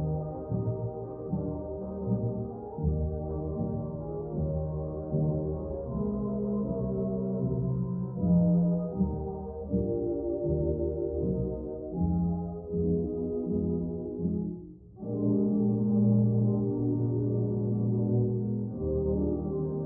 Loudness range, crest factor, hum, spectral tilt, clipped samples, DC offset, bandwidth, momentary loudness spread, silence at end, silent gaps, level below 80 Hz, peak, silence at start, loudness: 5 LU; 14 dB; none; -16.5 dB/octave; under 0.1%; under 0.1%; 1.6 kHz; 9 LU; 0 s; none; -44 dBFS; -14 dBFS; 0 s; -30 LUFS